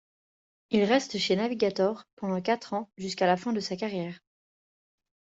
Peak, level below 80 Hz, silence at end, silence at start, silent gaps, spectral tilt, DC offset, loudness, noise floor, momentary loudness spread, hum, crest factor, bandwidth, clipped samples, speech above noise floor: -10 dBFS; -70 dBFS; 1.15 s; 0.7 s; 2.13-2.17 s; -5 dB/octave; under 0.1%; -28 LUFS; under -90 dBFS; 10 LU; none; 20 dB; 8 kHz; under 0.1%; over 62 dB